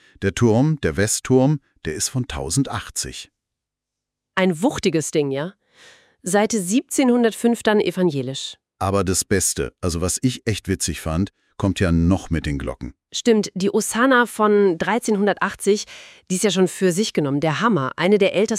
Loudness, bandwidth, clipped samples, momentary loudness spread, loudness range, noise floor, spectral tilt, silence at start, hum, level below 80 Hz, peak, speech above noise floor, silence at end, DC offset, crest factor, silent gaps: -20 LUFS; 16 kHz; under 0.1%; 10 LU; 5 LU; -84 dBFS; -4.5 dB/octave; 0.2 s; none; -44 dBFS; -4 dBFS; 64 dB; 0 s; under 0.1%; 18 dB; none